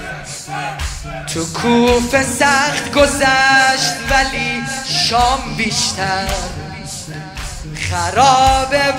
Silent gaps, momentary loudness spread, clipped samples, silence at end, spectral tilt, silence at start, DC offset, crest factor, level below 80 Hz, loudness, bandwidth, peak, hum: none; 16 LU; under 0.1%; 0 s; -3 dB/octave; 0 s; under 0.1%; 16 dB; -30 dBFS; -14 LUFS; 16 kHz; 0 dBFS; none